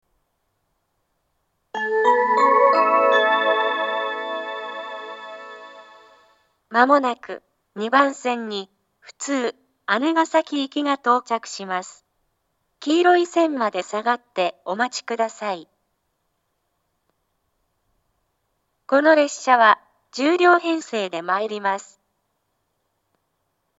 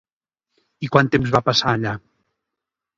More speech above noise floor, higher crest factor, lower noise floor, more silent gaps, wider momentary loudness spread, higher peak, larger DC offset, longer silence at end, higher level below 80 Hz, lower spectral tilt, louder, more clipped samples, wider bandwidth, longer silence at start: second, 53 dB vs 66 dB; about the same, 22 dB vs 22 dB; second, -73 dBFS vs -84 dBFS; neither; first, 17 LU vs 13 LU; about the same, 0 dBFS vs 0 dBFS; neither; first, 2 s vs 1 s; second, -78 dBFS vs -50 dBFS; second, -3 dB/octave vs -5.5 dB/octave; about the same, -20 LUFS vs -19 LUFS; neither; about the same, 8 kHz vs 7.8 kHz; first, 1.75 s vs 0.8 s